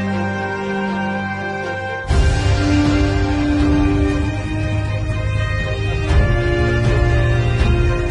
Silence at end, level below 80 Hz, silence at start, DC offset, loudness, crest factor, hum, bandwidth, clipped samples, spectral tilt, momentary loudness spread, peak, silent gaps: 0 s; -22 dBFS; 0 s; under 0.1%; -18 LUFS; 14 dB; none; 10.5 kHz; under 0.1%; -7 dB/octave; 6 LU; -4 dBFS; none